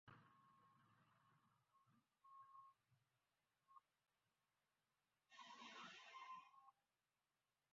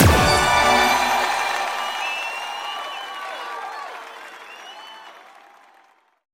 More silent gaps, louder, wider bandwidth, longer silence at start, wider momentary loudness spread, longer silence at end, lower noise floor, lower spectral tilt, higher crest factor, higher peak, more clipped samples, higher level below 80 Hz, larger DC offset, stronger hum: neither; second, -62 LUFS vs -20 LUFS; second, 7.4 kHz vs 16.5 kHz; about the same, 0.05 s vs 0 s; second, 9 LU vs 22 LU; second, 0.9 s vs 1.1 s; first, under -90 dBFS vs -57 dBFS; second, -0.5 dB/octave vs -3.5 dB/octave; about the same, 20 dB vs 22 dB; second, -48 dBFS vs 0 dBFS; neither; second, under -90 dBFS vs -36 dBFS; neither; neither